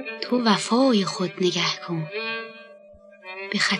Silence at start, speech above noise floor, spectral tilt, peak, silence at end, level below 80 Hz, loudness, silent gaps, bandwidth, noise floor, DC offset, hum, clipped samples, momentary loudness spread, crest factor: 0 s; 26 dB; -4 dB/octave; -6 dBFS; 0 s; -72 dBFS; -23 LUFS; none; 11 kHz; -49 dBFS; under 0.1%; none; under 0.1%; 16 LU; 20 dB